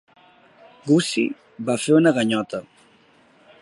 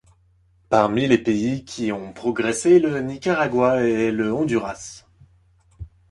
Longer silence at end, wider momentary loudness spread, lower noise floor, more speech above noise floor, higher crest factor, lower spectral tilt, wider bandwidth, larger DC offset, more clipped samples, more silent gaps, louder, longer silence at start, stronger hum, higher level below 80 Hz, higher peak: first, 1 s vs 0.25 s; first, 15 LU vs 10 LU; second, -55 dBFS vs -59 dBFS; about the same, 36 dB vs 39 dB; about the same, 18 dB vs 20 dB; about the same, -5 dB/octave vs -5.5 dB/octave; about the same, 11.5 kHz vs 11.5 kHz; neither; neither; neither; about the same, -20 LUFS vs -21 LUFS; first, 0.85 s vs 0.7 s; neither; second, -68 dBFS vs -52 dBFS; second, -6 dBFS vs -2 dBFS